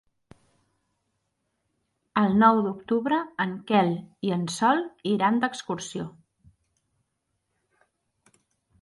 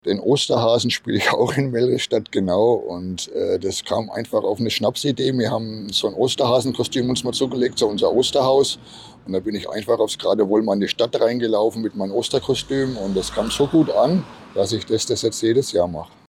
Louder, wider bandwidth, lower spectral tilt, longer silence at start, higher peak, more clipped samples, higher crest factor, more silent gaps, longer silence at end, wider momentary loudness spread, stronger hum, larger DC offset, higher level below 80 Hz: second, -25 LUFS vs -20 LUFS; second, 11.5 kHz vs 16.5 kHz; about the same, -5.5 dB/octave vs -4.5 dB/octave; first, 2.15 s vs 0.05 s; about the same, -6 dBFS vs -6 dBFS; neither; first, 22 dB vs 14 dB; neither; first, 2.7 s vs 0.2 s; first, 13 LU vs 7 LU; neither; neither; second, -66 dBFS vs -52 dBFS